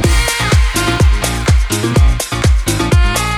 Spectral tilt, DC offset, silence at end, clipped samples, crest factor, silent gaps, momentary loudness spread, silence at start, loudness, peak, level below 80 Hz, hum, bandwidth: -4.5 dB/octave; under 0.1%; 0 s; under 0.1%; 12 dB; none; 2 LU; 0 s; -13 LUFS; 0 dBFS; -14 dBFS; none; 15 kHz